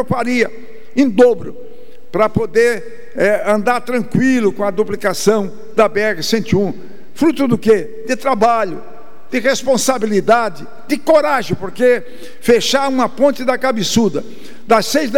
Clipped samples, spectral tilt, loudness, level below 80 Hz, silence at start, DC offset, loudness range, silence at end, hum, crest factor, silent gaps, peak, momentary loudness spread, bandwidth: under 0.1%; -4.5 dB/octave; -15 LUFS; -50 dBFS; 0 s; 6%; 1 LU; 0 s; none; 14 dB; none; 0 dBFS; 10 LU; 17 kHz